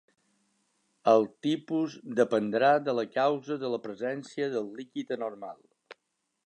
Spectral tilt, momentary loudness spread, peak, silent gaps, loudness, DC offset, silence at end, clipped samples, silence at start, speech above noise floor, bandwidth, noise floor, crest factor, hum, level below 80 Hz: -6 dB/octave; 12 LU; -10 dBFS; none; -29 LUFS; under 0.1%; 0.55 s; under 0.1%; 1.05 s; 51 dB; 10 kHz; -79 dBFS; 20 dB; none; -84 dBFS